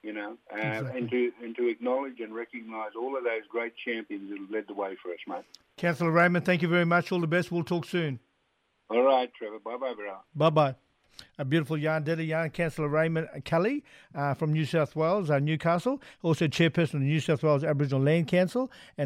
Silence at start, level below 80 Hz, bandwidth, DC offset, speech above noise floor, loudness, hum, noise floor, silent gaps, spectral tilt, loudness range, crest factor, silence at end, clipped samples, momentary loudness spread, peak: 0.05 s; -66 dBFS; 13 kHz; under 0.1%; 45 dB; -28 LUFS; none; -73 dBFS; none; -7 dB/octave; 6 LU; 16 dB; 0 s; under 0.1%; 14 LU; -12 dBFS